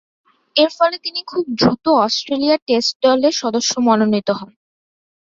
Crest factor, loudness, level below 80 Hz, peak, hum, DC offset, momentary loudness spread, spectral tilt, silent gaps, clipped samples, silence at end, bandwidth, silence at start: 16 dB; -17 LUFS; -56 dBFS; -2 dBFS; none; under 0.1%; 8 LU; -4 dB/octave; 2.62-2.66 s, 2.96-3.00 s; under 0.1%; 0.8 s; 7.8 kHz; 0.55 s